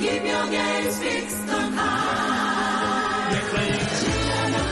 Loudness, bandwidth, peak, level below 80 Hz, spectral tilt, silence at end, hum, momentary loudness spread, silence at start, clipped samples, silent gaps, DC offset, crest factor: -23 LUFS; 12.5 kHz; -12 dBFS; -42 dBFS; -4 dB/octave; 0 s; none; 2 LU; 0 s; under 0.1%; none; under 0.1%; 12 dB